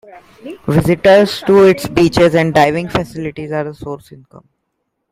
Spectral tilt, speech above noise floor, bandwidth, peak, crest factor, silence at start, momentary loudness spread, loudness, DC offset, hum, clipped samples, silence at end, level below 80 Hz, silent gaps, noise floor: -6.5 dB/octave; 58 dB; 15.5 kHz; 0 dBFS; 14 dB; 0.15 s; 17 LU; -12 LUFS; under 0.1%; none; under 0.1%; 0.95 s; -42 dBFS; none; -71 dBFS